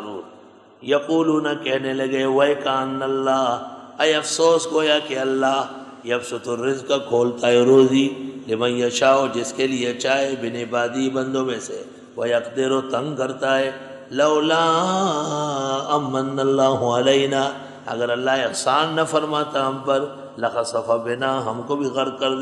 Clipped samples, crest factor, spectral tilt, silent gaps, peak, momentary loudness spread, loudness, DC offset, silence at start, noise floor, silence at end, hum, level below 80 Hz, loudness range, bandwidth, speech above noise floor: under 0.1%; 18 dB; -4 dB/octave; none; -4 dBFS; 9 LU; -20 LUFS; under 0.1%; 0 s; -47 dBFS; 0 s; none; -70 dBFS; 4 LU; 12 kHz; 27 dB